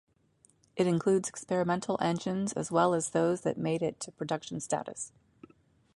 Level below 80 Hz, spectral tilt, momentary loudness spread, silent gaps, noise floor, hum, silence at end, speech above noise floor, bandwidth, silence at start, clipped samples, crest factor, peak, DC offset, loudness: -68 dBFS; -5.5 dB/octave; 10 LU; none; -67 dBFS; none; 0.9 s; 37 dB; 11.5 kHz; 0.75 s; under 0.1%; 20 dB; -12 dBFS; under 0.1%; -31 LUFS